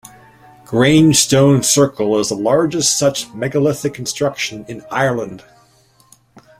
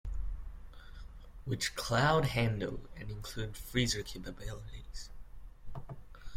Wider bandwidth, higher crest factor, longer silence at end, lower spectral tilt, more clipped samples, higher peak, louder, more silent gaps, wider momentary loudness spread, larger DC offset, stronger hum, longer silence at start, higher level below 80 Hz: about the same, 16 kHz vs 16.5 kHz; second, 16 dB vs 22 dB; first, 1.2 s vs 0 s; about the same, -4 dB/octave vs -4.5 dB/octave; neither; first, 0 dBFS vs -14 dBFS; first, -15 LUFS vs -35 LUFS; neither; second, 12 LU vs 24 LU; neither; neither; first, 0.7 s vs 0.05 s; about the same, -50 dBFS vs -46 dBFS